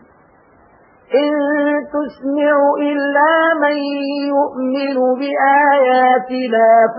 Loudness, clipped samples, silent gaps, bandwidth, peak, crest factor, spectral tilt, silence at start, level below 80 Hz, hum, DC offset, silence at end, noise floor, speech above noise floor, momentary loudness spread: -15 LUFS; under 0.1%; none; 5.2 kHz; -2 dBFS; 12 dB; -9.5 dB/octave; 1.1 s; -66 dBFS; none; under 0.1%; 0 s; -49 dBFS; 35 dB; 8 LU